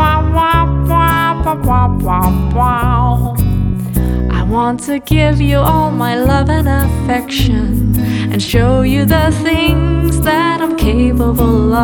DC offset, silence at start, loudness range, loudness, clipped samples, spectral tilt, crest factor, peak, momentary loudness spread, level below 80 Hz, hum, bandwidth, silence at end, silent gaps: under 0.1%; 0 s; 1 LU; -13 LUFS; under 0.1%; -6.5 dB/octave; 12 dB; 0 dBFS; 4 LU; -18 dBFS; none; 20 kHz; 0 s; none